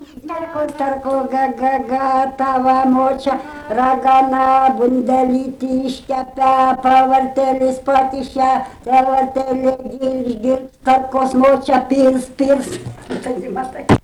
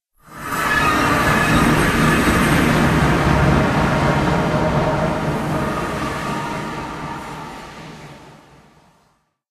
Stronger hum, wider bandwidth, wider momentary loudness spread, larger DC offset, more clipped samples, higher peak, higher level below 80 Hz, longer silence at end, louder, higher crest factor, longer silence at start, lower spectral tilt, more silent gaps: neither; second, 12.5 kHz vs 14 kHz; second, 10 LU vs 16 LU; neither; neither; about the same, -4 dBFS vs -2 dBFS; second, -44 dBFS vs -32 dBFS; second, 0.05 s vs 1.2 s; about the same, -16 LUFS vs -17 LUFS; about the same, 12 dB vs 16 dB; second, 0 s vs 0.3 s; about the same, -6.5 dB/octave vs -5.5 dB/octave; neither